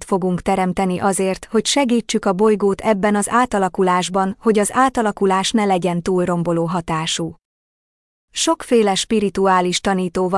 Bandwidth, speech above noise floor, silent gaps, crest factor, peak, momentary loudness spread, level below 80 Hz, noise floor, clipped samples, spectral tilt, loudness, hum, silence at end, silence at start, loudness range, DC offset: 12 kHz; over 73 dB; 7.45-8.28 s; 14 dB; -4 dBFS; 4 LU; -48 dBFS; under -90 dBFS; under 0.1%; -4.5 dB/octave; -18 LUFS; none; 0 s; 0 s; 3 LU; under 0.1%